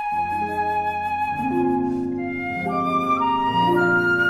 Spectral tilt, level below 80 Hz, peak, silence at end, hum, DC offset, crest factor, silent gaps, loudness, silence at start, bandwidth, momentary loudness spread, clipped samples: -6.5 dB/octave; -54 dBFS; -8 dBFS; 0 s; none; under 0.1%; 14 dB; none; -22 LUFS; 0 s; 15 kHz; 7 LU; under 0.1%